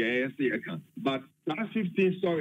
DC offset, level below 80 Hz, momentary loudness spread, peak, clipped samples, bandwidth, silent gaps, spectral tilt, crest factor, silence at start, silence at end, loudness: under 0.1%; -80 dBFS; 8 LU; -14 dBFS; under 0.1%; 8.2 kHz; none; -7.5 dB/octave; 16 dB; 0 s; 0 s; -30 LUFS